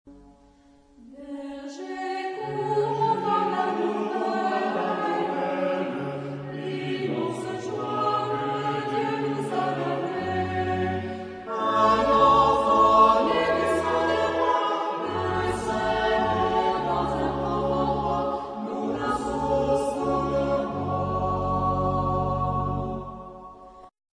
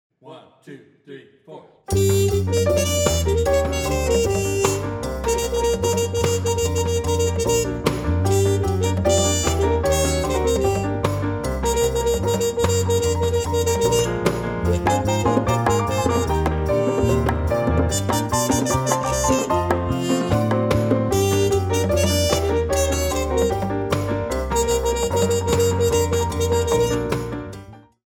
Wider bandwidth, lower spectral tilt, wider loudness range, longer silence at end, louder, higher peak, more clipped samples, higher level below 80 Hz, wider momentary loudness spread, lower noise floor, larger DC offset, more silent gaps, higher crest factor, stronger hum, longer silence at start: second, 11 kHz vs over 20 kHz; first, -6.5 dB/octave vs -5 dB/octave; first, 8 LU vs 1 LU; about the same, 0.25 s vs 0.3 s; second, -25 LUFS vs -20 LUFS; second, -8 dBFS vs -4 dBFS; neither; second, -46 dBFS vs -32 dBFS; first, 13 LU vs 4 LU; first, -56 dBFS vs -44 dBFS; neither; neither; about the same, 18 dB vs 16 dB; neither; second, 0.05 s vs 0.25 s